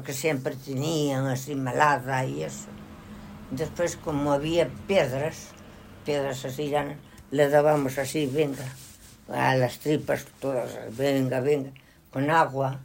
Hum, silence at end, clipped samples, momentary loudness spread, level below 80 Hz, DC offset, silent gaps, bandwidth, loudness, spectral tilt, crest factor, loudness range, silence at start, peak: none; 0 s; under 0.1%; 17 LU; -56 dBFS; under 0.1%; none; 16.5 kHz; -26 LUFS; -5.5 dB/octave; 20 dB; 3 LU; 0 s; -6 dBFS